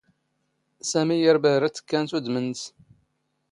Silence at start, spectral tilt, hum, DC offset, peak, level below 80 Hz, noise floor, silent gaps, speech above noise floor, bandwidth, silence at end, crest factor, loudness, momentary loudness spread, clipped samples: 0.85 s; -4.5 dB/octave; none; under 0.1%; -6 dBFS; -72 dBFS; -74 dBFS; none; 51 dB; 11.5 kHz; 0.85 s; 20 dB; -23 LUFS; 14 LU; under 0.1%